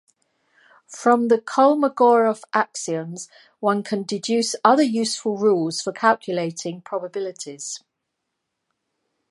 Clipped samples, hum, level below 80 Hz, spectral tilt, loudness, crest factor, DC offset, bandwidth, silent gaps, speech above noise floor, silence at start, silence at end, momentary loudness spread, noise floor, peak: under 0.1%; none; -78 dBFS; -4 dB/octave; -21 LUFS; 20 dB; under 0.1%; 11.5 kHz; none; 58 dB; 0.9 s; 1.55 s; 15 LU; -79 dBFS; -2 dBFS